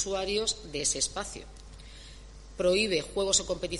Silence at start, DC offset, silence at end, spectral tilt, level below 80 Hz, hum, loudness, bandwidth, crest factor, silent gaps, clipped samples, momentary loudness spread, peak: 0 s; under 0.1%; 0 s; -2 dB/octave; -48 dBFS; none; -28 LUFS; 11.5 kHz; 22 dB; none; under 0.1%; 23 LU; -10 dBFS